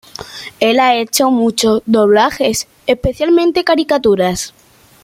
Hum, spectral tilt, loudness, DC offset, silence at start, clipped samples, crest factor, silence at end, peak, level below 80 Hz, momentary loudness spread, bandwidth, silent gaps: none; -4 dB/octave; -13 LUFS; under 0.1%; 0.2 s; under 0.1%; 12 dB; 0.55 s; 0 dBFS; -40 dBFS; 10 LU; 16.5 kHz; none